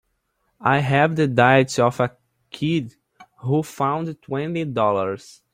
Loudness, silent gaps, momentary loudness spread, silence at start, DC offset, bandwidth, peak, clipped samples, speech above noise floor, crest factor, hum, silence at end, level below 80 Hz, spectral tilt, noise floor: -21 LUFS; none; 12 LU; 0.6 s; under 0.1%; 15.5 kHz; -2 dBFS; under 0.1%; 51 dB; 20 dB; none; 0.35 s; -60 dBFS; -6 dB/octave; -71 dBFS